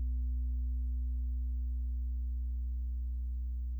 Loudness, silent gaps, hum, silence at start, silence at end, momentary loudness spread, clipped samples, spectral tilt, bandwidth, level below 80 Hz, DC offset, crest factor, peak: -38 LUFS; none; none; 0 s; 0 s; 2 LU; under 0.1%; -10.5 dB/octave; 0.3 kHz; -34 dBFS; under 0.1%; 6 dB; -30 dBFS